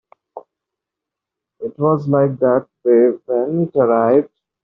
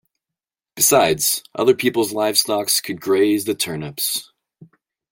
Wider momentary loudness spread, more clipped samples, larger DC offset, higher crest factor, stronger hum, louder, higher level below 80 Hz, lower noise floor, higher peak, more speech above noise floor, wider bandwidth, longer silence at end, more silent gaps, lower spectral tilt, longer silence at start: about the same, 8 LU vs 8 LU; neither; neither; about the same, 16 dB vs 18 dB; neither; about the same, -16 LUFS vs -18 LUFS; about the same, -64 dBFS vs -60 dBFS; about the same, -84 dBFS vs -87 dBFS; about the same, -2 dBFS vs -2 dBFS; about the same, 69 dB vs 68 dB; second, 2.7 kHz vs 17 kHz; second, 0.4 s vs 0.9 s; neither; first, -10.5 dB/octave vs -2.5 dB/octave; second, 0.35 s vs 0.75 s